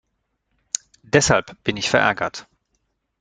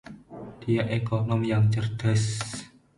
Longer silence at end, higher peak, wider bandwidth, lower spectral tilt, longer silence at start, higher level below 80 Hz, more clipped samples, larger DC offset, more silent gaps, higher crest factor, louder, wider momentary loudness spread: first, 0.8 s vs 0.3 s; first, 0 dBFS vs -12 dBFS; second, 9.6 kHz vs 11.5 kHz; second, -3.5 dB/octave vs -6 dB/octave; first, 1.15 s vs 0.05 s; about the same, -50 dBFS vs -52 dBFS; neither; neither; neither; first, 22 dB vs 14 dB; first, -20 LUFS vs -26 LUFS; second, 12 LU vs 17 LU